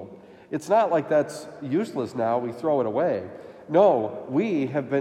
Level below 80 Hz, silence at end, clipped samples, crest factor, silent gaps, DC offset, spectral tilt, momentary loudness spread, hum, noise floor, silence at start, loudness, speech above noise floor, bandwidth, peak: -74 dBFS; 0 s; under 0.1%; 18 dB; none; under 0.1%; -7 dB/octave; 14 LU; none; -44 dBFS; 0 s; -24 LUFS; 21 dB; 13.5 kHz; -6 dBFS